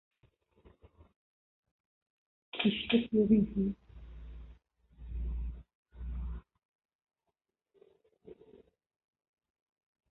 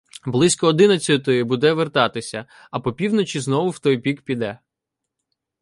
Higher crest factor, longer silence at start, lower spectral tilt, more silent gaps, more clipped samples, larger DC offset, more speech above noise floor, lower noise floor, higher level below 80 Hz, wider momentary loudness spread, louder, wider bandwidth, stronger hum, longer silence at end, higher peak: about the same, 22 dB vs 18 dB; first, 2.55 s vs 0.25 s; about the same, -5.5 dB/octave vs -5 dB/octave; first, 5.75-5.83 s, 6.65-6.79 s, 6.85-6.89 s, 6.95-6.99 s vs none; neither; neither; second, 58 dB vs 63 dB; first, -87 dBFS vs -83 dBFS; first, -48 dBFS vs -58 dBFS; first, 26 LU vs 13 LU; second, -33 LUFS vs -19 LUFS; second, 4.2 kHz vs 11.5 kHz; neither; first, 1.8 s vs 1.05 s; second, -14 dBFS vs -2 dBFS